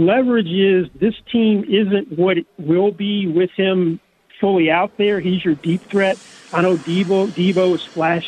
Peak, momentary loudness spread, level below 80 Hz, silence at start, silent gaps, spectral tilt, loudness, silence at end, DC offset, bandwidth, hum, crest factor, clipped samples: -2 dBFS; 5 LU; -58 dBFS; 0 s; none; -7 dB/octave; -18 LUFS; 0 s; under 0.1%; 9.6 kHz; none; 14 dB; under 0.1%